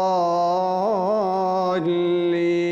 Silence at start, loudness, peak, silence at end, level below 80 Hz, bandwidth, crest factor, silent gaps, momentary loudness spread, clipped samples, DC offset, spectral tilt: 0 s; -21 LUFS; -12 dBFS; 0 s; -66 dBFS; 7.4 kHz; 8 dB; none; 1 LU; under 0.1%; under 0.1%; -7 dB/octave